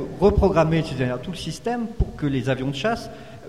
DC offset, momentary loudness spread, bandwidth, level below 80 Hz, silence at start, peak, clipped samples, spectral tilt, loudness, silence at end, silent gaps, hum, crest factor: 0.4%; 11 LU; 13.5 kHz; -34 dBFS; 0 s; -4 dBFS; under 0.1%; -7 dB/octave; -23 LUFS; 0 s; none; none; 18 dB